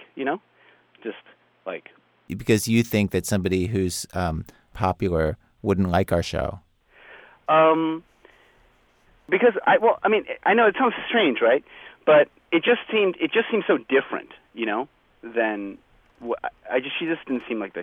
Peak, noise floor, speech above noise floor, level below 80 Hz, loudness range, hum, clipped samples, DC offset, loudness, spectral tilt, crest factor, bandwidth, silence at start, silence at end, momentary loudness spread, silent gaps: -6 dBFS; -59 dBFS; 37 dB; -48 dBFS; 6 LU; none; under 0.1%; under 0.1%; -22 LUFS; -5.5 dB/octave; 18 dB; over 20 kHz; 0 s; 0 s; 17 LU; none